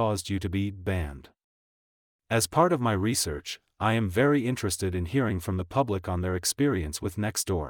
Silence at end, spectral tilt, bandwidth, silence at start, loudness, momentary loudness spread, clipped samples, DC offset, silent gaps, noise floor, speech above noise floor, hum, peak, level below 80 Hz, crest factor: 0 s; -5 dB/octave; 19.5 kHz; 0 s; -27 LUFS; 8 LU; under 0.1%; under 0.1%; 1.44-2.19 s; under -90 dBFS; over 63 dB; none; -10 dBFS; -46 dBFS; 18 dB